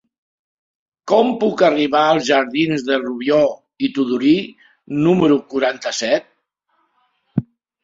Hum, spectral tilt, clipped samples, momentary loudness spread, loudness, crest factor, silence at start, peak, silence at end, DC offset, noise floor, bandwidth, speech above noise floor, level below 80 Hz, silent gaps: none; -5.5 dB/octave; under 0.1%; 11 LU; -17 LUFS; 16 dB; 1.05 s; -2 dBFS; 0.4 s; under 0.1%; -67 dBFS; 7.6 kHz; 50 dB; -58 dBFS; none